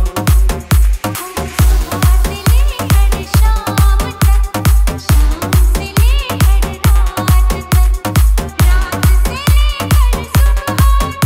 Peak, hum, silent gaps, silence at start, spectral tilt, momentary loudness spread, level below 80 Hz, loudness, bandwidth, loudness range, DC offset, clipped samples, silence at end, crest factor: 0 dBFS; none; none; 0 s; -5 dB/octave; 1 LU; -12 dBFS; -13 LUFS; 16.5 kHz; 1 LU; under 0.1%; under 0.1%; 0 s; 10 dB